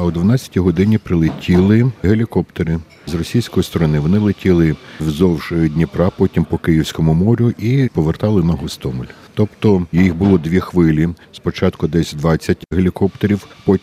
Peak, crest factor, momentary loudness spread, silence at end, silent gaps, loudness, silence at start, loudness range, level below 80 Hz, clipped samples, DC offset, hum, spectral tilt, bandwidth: 0 dBFS; 14 dB; 7 LU; 0.05 s; none; -16 LUFS; 0 s; 1 LU; -34 dBFS; under 0.1%; under 0.1%; none; -8 dB/octave; 15 kHz